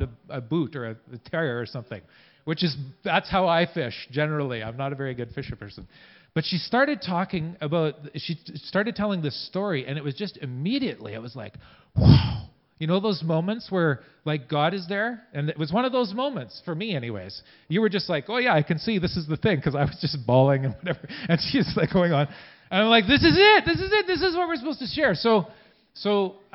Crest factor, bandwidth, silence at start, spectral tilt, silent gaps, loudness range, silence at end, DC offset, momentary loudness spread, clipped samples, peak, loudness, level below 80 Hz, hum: 22 dB; 5.8 kHz; 0 s; -10.5 dB/octave; none; 8 LU; 0.2 s; under 0.1%; 15 LU; under 0.1%; -2 dBFS; -24 LUFS; -44 dBFS; none